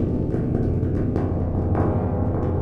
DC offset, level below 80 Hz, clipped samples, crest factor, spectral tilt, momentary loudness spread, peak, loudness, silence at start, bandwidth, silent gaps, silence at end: under 0.1%; -32 dBFS; under 0.1%; 14 dB; -11.5 dB/octave; 2 LU; -8 dBFS; -23 LUFS; 0 s; 3.3 kHz; none; 0 s